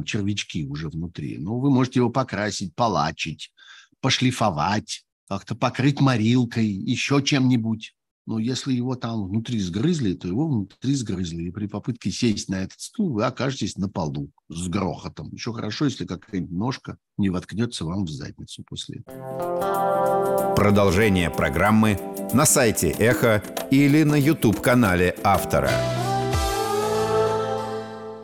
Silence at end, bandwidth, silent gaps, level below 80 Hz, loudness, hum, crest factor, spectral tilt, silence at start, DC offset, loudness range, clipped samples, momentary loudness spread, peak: 0 s; 20 kHz; 5.12-5.27 s, 8.11-8.25 s; -44 dBFS; -23 LUFS; none; 18 dB; -5 dB/octave; 0 s; under 0.1%; 9 LU; under 0.1%; 14 LU; -6 dBFS